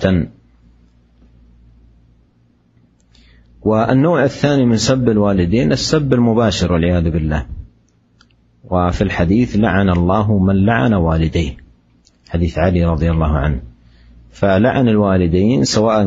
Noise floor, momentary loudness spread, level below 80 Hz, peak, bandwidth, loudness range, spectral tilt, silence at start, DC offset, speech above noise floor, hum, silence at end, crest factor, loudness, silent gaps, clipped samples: -55 dBFS; 8 LU; -30 dBFS; 0 dBFS; 8 kHz; 5 LU; -6.5 dB/octave; 0 s; under 0.1%; 41 dB; none; 0 s; 16 dB; -15 LUFS; none; under 0.1%